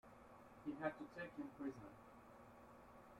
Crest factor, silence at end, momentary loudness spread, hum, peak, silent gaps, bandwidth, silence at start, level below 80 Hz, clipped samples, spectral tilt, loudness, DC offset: 24 dB; 0 s; 16 LU; none; -30 dBFS; none; 16 kHz; 0.05 s; -78 dBFS; under 0.1%; -7 dB/octave; -52 LUFS; under 0.1%